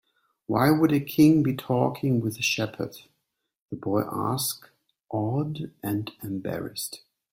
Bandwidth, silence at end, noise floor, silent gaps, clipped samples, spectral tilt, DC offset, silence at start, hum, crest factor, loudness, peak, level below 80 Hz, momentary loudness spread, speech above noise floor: 16.5 kHz; 0.35 s; -78 dBFS; 3.62-3.69 s; under 0.1%; -5.5 dB/octave; under 0.1%; 0.5 s; none; 20 dB; -26 LUFS; -6 dBFS; -62 dBFS; 15 LU; 53 dB